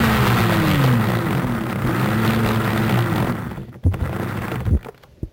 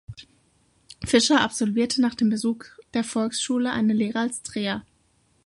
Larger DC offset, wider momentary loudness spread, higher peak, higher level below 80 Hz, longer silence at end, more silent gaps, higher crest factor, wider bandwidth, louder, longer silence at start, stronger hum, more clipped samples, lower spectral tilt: neither; second, 8 LU vs 13 LU; about the same, -6 dBFS vs -6 dBFS; first, -32 dBFS vs -54 dBFS; second, 0.05 s vs 0.65 s; neither; second, 14 dB vs 20 dB; first, 17 kHz vs 11.5 kHz; first, -20 LUFS vs -24 LUFS; about the same, 0 s vs 0.1 s; neither; neither; first, -6.5 dB/octave vs -3.5 dB/octave